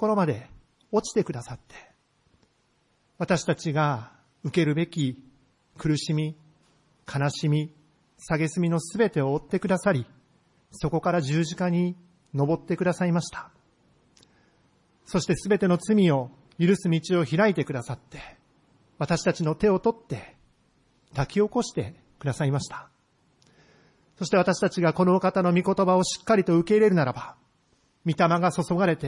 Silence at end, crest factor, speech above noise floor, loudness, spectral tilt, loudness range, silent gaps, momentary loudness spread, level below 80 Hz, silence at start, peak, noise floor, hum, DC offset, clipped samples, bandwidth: 0 s; 18 dB; 44 dB; -25 LUFS; -6.5 dB/octave; 7 LU; none; 15 LU; -56 dBFS; 0 s; -8 dBFS; -68 dBFS; none; under 0.1%; under 0.1%; 11.5 kHz